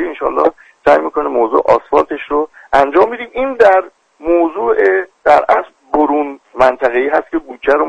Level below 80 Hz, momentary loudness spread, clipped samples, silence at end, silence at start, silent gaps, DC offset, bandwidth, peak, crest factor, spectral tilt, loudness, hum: -44 dBFS; 8 LU; under 0.1%; 0 s; 0 s; none; under 0.1%; 9.2 kHz; 0 dBFS; 14 dB; -5.5 dB/octave; -13 LUFS; none